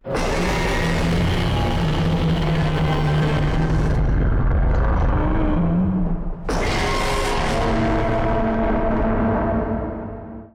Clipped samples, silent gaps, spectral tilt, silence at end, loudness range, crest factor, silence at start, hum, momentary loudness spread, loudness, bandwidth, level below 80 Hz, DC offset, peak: under 0.1%; none; -6.5 dB/octave; 0.05 s; 1 LU; 6 dB; 0.05 s; none; 4 LU; -21 LUFS; 13.5 kHz; -24 dBFS; under 0.1%; -12 dBFS